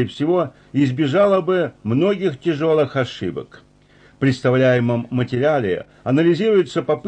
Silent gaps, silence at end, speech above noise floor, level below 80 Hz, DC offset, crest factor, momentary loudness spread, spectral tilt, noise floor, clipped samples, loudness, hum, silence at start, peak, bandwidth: none; 0 s; 33 dB; -56 dBFS; under 0.1%; 12 dB; 8 LU; -7.5 dB/octave; -51 dBFS; under 0.1%; -19 LUFS; none; 0 s; -6 dBFS; 9 kHz